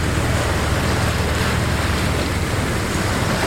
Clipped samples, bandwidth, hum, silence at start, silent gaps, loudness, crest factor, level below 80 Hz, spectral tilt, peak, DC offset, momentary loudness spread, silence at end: under 0.1%; 16.5 kHz; none; 0 s; none; -20 LUFS; 12 dB; -26 dBFS; -4.5 dB/octave; -6 dBFS; under 0.1%; 2 LU; 0 s